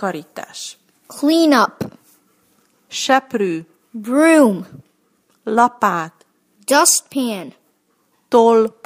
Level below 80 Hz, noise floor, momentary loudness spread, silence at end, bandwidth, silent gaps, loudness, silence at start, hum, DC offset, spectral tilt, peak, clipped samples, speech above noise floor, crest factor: -68 dBFS; -63 dBFS; 20 LU; 0.15 s; 15.5 kHz; none; -15 LUFS; 0 s; none; under 0.1%; -3 dB/octave; 0 dBFS; under 0.1%; 47 dB; 18 dB